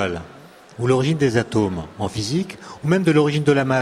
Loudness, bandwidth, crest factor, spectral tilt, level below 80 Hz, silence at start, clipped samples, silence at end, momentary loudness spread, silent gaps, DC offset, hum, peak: -20 LUFS; 13 kHz; 16 dB; -6.5 dB/octave; -50 dBFS; 0 s; under 0.1%; 0 s; 10 LU; none; under 0.1%; none; -4 dBFS